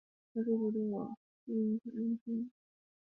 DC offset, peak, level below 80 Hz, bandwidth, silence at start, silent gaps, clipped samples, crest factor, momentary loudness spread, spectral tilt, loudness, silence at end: under 0.1%; -22 dBFS; -82 dBFS; 1.7 kHz; 0.35 s; 1.17-1.47 s, 2.21-2.26 s; under 0.1%; 14 dB; 11 LU; -12 dB/octave; -37 LUFS; 0.65 s